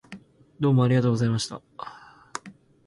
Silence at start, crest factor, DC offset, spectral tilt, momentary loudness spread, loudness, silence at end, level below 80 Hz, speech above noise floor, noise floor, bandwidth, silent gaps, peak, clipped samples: 0.1 s; 16 dB; under 0.1%; -6.5 dB/octave; 21 LU; -23 LUFS; 0.35 s; -60 dBFS; 26 dB; -49 dBFS; 11.5 kHz; none; -10 dBFS; under 0.1%